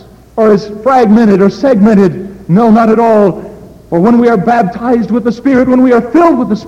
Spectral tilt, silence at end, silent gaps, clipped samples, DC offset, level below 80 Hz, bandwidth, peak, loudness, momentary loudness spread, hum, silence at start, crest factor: -8.5 dB/octave; 0 s; none; under 0.1%; under 0.1%; -40 dBFS; 8.2 kHz; 0 dBFS; -8 LUFS; 6 LU; none; 0.35 s; 8 dB